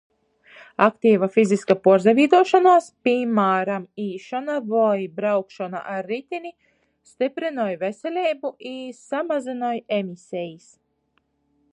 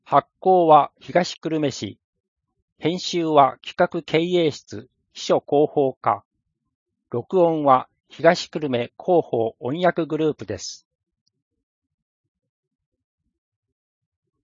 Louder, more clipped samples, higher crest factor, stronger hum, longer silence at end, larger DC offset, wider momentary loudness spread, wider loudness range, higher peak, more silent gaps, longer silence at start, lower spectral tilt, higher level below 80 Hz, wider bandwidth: about the same, -21 LUFS vs -21 LUFS; neither; about the same, 20 dB vs 22 dB; neither; second, 1.15 s vs 3.7 s; neither; about the same, 16 LU vs 14 LU; first, 10 LU vs 7 LU; about the same, -2 dBFS vs -2 dBFS; second, none vs 2.04-2.13 s, 2.20-2.36 s, 2.62-2.76 s, 5.97-6.01 s, 6.25-6.31 s, 6.75-6.86 s; first, 0.55 s vs 0.1 s; about the same, -6 dB/octave vs -5.5 dB/octave; second, -74 dBFS vs -68 dBFS; first, 10.5 kHz vs 7.6 kHz